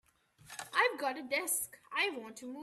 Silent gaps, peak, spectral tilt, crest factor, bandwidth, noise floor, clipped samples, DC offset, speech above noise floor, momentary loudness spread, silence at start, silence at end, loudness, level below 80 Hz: none; -16 dBFS; -0.5 dB/octave; 22 dB; 15.5 kHz; -61 dBFS; under 0.1%; under 0.1%; 24 dB; 15 LU; 0.45 s; 0 s; -34 LUFS; -80 dBFS